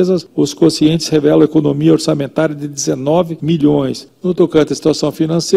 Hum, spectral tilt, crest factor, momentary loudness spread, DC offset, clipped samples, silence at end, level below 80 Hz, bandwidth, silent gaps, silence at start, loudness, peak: none; -6 dB/octave; 12 dB; 7 LU; under 0.1%; under 0.1%; 0 s; -48 dBFS; 14 kHz; none; 0 s; -14 LUFS; 0 dBFS